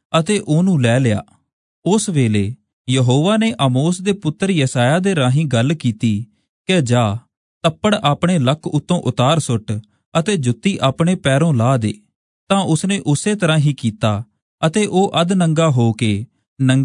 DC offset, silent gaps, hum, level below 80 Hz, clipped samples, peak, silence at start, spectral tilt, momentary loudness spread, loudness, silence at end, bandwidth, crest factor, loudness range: under 0.1%; 1.53-1.82 s, 2.73-2.85 s, 6.49-6.65 s, 7.37-7.61 s, 10.05-10.12 s, 12.15-12.47 s, 14.42-14.58 s, 16.47-16.56 s; none; -56 dBFS; under 0.1%; -2 dBFS; 0.1 s; -6 dB/octave; 7 LU; -17 LUFS; 0 s; 11 kHz; 14 dB; 2 LU